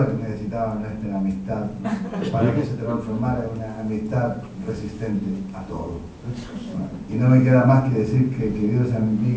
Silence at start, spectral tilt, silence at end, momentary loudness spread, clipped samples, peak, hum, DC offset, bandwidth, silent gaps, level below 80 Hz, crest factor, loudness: 0 s; -9.5 dB/octave; 0 s; 14 LU; under 0.1%; -4 dBFS; none; under 0.1%; 7.8 kHz; none; -44 dBFS; 18 dB; -23 LUFS